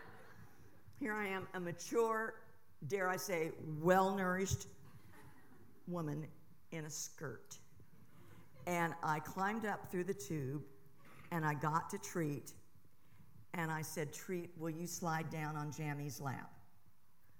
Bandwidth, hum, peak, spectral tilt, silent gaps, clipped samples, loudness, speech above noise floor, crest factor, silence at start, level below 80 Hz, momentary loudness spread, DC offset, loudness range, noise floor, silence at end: 17.5 kHz; none; -16 dBFS; -5 dB/octave; none; under 0.1%; -41 LUFS; 33 dB; 26 dB; 0 s; -72 dBFS; 20 LU; 0.2%; 8 LU; -73 dBFS; 0.8 s